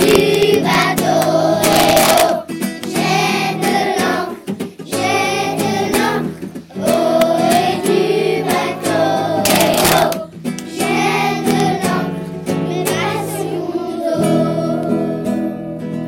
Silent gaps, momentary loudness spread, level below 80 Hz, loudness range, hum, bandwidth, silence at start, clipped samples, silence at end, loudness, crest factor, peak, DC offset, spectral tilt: none; 11 LU; -46 dBFS; 4 LU; none; 17 kHz; 0 s; under 0.1%; 0 s; -16 LUFS; 16 dB; 0 dBFS; under 0.1%; -4 dB/octave